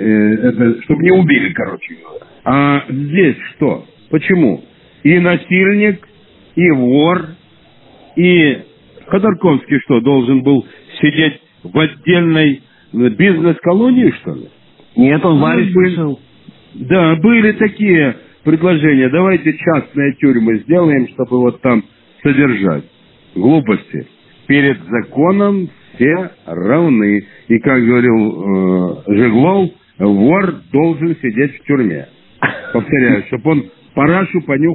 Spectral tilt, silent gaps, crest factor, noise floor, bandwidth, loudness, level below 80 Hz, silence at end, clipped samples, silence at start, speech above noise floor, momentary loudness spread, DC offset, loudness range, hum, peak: -6 dB/octave; none; 12 dB; -46 dBFS; 4.1 kHz; -12 LUFS; -50 dBFS; 0 s; under 0.1%; 0 s; 34 dB; 10 LU; under 0.1%; 3 LU; none; 0 dBFS